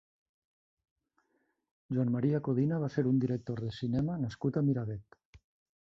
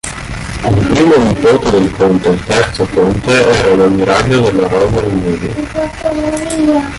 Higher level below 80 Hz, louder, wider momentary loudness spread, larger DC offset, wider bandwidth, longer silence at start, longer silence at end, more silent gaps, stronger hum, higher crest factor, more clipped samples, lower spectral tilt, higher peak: second, -62 dBFS vs -30 dBFS; second, -32 LUFS vs -11 LUFS; about the same, 7 LU vs 9 LU; neither; second, 7.2 kHz vs 11.5 kHz; first, 1.9 s vs 0.05 s; first, 0.5 s vs 0 s; first, 5.25-5.33 s vs none; neither; first, 16 dB vs 10 dB; neither; first, -9.5 dB/octave vs -6 dB/octave; second, -18 dBFS vs 0 dBFS